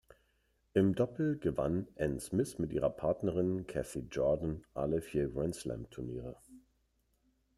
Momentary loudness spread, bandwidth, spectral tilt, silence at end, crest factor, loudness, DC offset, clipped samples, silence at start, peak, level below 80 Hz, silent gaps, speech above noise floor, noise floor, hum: 11 LU; 13 kHz; -7 dB/octave; 1 s; 20 dB; -35 LUFS; under 0.1%; under 0.1%; 0.75 s; -16 dBFS; -56 dBFS; none; 42 dB; -76 dBFS; none